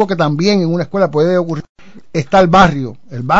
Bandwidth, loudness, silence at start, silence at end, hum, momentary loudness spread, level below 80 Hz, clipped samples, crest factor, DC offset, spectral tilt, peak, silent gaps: 7.8 kHz; -13 LUFS; 0 s; 0 s; none; 14 LU; -38 dBFS; under 0.1%; 14 dB; 2%; -6.5 dB/octave; 0 dBFS; 1.69-1.75 s